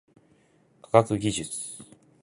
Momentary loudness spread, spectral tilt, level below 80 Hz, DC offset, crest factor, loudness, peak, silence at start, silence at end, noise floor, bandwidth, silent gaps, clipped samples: 16 LU; -5 dB/octave; -58 dBFS; under 0.1%; 26 dB; -25 LUFS; -2 dBFS; 0.95 s; 0.4 s; -63 dBFS; 11.5 kHz; none; under 0.1%